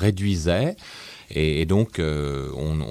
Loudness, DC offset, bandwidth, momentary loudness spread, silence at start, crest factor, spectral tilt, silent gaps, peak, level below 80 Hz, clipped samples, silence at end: -24 LUFS; under 0.1%; 14 kHz; 13 LU; 0 s; 16 dB; -6.5 dB/octave; none; -8 dBFS; -36 dBFS; under 0.1%; 0 s